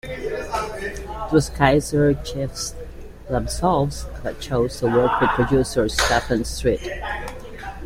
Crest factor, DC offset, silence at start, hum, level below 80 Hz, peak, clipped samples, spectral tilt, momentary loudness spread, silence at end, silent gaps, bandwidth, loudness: 22 dB; under 0.1%; 0.05 s; none; -34 dBFS; 0 dBFS; under 0.1%; -5 dB/octave; 13 LU; 0 s; none; 16.5 kHz; -22 LUFS